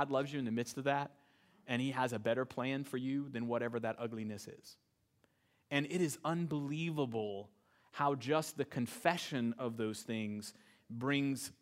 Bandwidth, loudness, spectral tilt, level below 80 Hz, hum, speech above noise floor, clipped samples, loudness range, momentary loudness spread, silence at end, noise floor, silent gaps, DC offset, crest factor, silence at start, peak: 16 kHz; -38 LUFS; -5.5 dB/octave; -82 dBFS; none; 38 dB; under 0.1%; 3 LU; 9 LU; 0.1 s; -76 dBFS; none; under 0.1%; 24 dB; 0 s; -14 dBFS